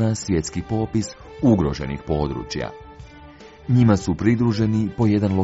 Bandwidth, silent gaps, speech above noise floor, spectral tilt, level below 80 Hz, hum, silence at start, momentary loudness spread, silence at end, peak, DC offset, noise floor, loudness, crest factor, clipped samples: 8 kHz; none; 23 dB; -7.5 dB/octave; -40 dBFS; none; 0 s; 11 LU; 0 s; -4 dBFS; under 0.1%; -43 dBFS; -21 LUFS; 18 dB; under 0.1%